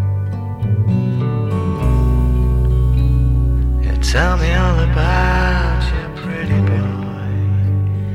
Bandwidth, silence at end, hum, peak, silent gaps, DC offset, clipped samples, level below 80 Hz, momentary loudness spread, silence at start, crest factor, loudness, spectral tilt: 10.5 kHz; 0 s; none; -2 dBFS; none; under 0.1%; under 0.1%; -18 dBFS; 6 LU; 0 s; 12 dB; -17 LUFS; -7 dB/octave